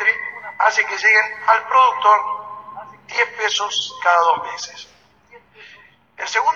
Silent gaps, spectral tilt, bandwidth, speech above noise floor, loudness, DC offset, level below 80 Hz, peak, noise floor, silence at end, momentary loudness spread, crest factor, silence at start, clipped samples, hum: none; 0.5 dB/octave; 7.6 kHz; 32 dB; -17 LUFS; under 0.1%; -70 dBFS; -2 dBFS; -49 dBFS; 0 s; 18 LU; 18 dB; 0 s; under 0.1%; none